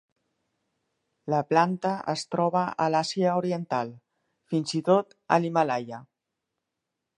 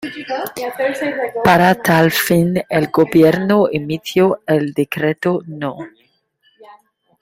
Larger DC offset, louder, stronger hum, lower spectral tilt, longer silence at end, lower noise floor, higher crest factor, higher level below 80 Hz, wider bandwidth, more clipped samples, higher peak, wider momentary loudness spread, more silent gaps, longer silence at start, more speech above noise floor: neither; second, -26 LUFS vs -16 LUFS; neither; about the same, -6 dB/octave vs -6 dB/octave; first, 1.15 s vs 0.5 s; first, -84 dBFS vs -60 dBFS; first, 22 dB vs 16 dB; second, -76 dBFS vs -52 dBFS; second, 11 kHz vs 16 kHz; neither; second, -6 dBFS vs 0 dBFS; second, 8 LU vs 13 LU; neither; first, 1.25 s vs 0 s; first, 59 dB vs 44 dB